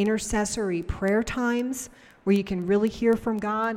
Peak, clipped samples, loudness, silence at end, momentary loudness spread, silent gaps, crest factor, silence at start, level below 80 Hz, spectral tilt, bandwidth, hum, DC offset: -10 dBFS; under 0.1%; -26 LUFS; 0 s; 7 LU; none; 16 dB; 0 s; -44 dBFS; -5.5 dB/octave; 16 kHz; none; under 0.1%